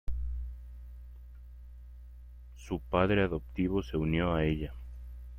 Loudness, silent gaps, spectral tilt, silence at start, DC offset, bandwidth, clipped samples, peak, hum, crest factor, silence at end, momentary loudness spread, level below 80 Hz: -32 LUFS; none; -8 dB/octave; 0.05 s; under 0.1%; 14.5 kHz; under 0.1%; -12 dBFS; 60 Hz at -45 dBFS; 22 dB; 0 s; 23 LU; -42 dBFS